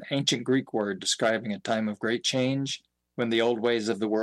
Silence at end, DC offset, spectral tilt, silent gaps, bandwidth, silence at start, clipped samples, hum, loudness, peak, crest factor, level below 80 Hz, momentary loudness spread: 0 s; under 0.1%; -4 dB/octave; none; 12.5 kHz; 0 s; under 0.1%; none; -27 LUFS; -12 dBFS; 16 dB; -74 dBFS; 6 LU